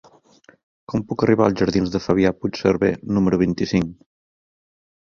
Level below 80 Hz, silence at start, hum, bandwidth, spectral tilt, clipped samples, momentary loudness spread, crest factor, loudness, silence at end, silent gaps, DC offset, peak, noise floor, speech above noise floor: -46 dBFS; 0.9 s; none; 7.2 kHz; -7 dB/octave; under 0.1%; 8 LU; 20 dB; -20 LUFS; 1.15 s; none; under 0.1%; -2 dBFS; -53 dBFS; 34 dB